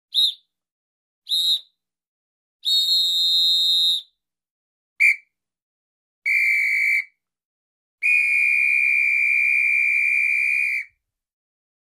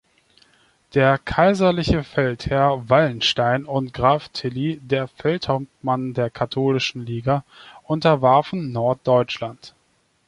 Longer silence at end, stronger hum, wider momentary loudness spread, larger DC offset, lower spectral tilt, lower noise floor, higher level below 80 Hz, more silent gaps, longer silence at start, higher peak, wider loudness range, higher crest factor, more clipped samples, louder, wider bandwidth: first, 1.05 s vs 0.6 s; neither; about the same, 8 LU vs 9 LU; neither; second, 4.5 dB/octave vs -6.5 dB/octave; second, -59 dBFS vs -64 dBFS; second, -74 dBFS vs -44 dBFS; first, 0.72-1.22 s, 2.08-2.60 s, 4.51-4.96 s, 5.62-6.22 s, 7.45-7.98 s vs none; second, 0.15 s vs 0.95 s; second, -6 dBFS vs -2 dBFS; about the same, 4 LU vs 4 LU; about the same, 16 dB vs 18 dB; neither; first, -17 LUFS vs -20 LUFS; first, 16 kHz vs 11 kHz